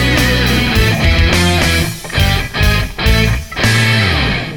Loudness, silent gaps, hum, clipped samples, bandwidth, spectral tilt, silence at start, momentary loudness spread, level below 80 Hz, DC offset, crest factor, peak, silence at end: -12 LUFS; none; none; under 0.1%; 20 kHz; -4.5 dB/octave; 0 s; 4 LU; -18 dBFS; 1%; 12 dB; 0 dBFS; 0 s